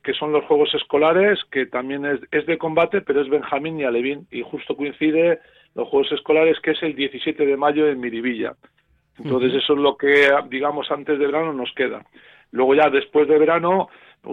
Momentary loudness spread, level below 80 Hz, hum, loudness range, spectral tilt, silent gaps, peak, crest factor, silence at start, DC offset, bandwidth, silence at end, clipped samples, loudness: 11 LU; -62 dBFS; none; 3 LU; -6.5 dB/octave; none; -4 dBFS; 16 dB; 0.05 s; under 0.1%; 5.8 kHz; 0 s; under 0.1%; -20 LUFS